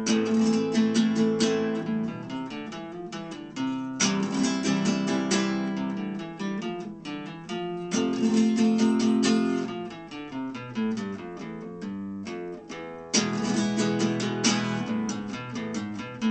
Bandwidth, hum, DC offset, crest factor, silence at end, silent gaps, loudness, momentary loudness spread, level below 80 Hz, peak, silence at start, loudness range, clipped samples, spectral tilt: 8.8 kHz; none; under 0.1%; 18 dB; 0 s; none; -27 LUFS; 14 LU; -66 dBFS; -10 dBFS; 0 s; 5 LU; under 0.1%; -4.5 dB/octave